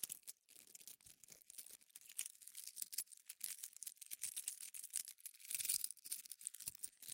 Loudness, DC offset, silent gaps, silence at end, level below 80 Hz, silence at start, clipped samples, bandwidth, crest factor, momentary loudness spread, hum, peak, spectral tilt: -47 LUFS; under 0.1%; none; 0 s; under -90 dBFS; 0 s; under 0.1%; 17 kHz; 28 dB; 16 LU; none; -22 dBFS; 2.5 dB/octave